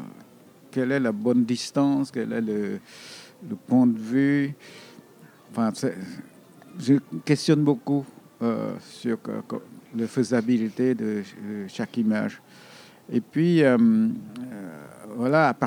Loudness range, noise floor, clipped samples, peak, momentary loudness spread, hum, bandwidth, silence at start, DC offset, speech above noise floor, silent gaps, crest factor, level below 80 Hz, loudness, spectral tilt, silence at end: 3 LU; -52 dBFS; under 0.1%; -6 dBFS; 19 LU; none; 14 kHz; 0 s; under 0.1%; 28 dB; none; 18 dB; -78 dBFS; -24 LUFS; -6.5 dB/octave; 0 s